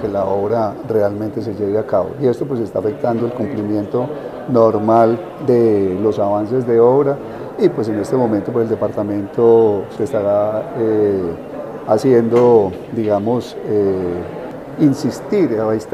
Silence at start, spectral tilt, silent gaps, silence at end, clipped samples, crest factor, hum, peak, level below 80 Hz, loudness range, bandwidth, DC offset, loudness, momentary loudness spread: 0 s; -8.5 dB/octave; none; 0 s; under 0.1%; 16 dB; none; 0 dBFS; -54 dBFS; 4 LU; 13 kHz; under 0.1%; -16 LUFS; 9 LU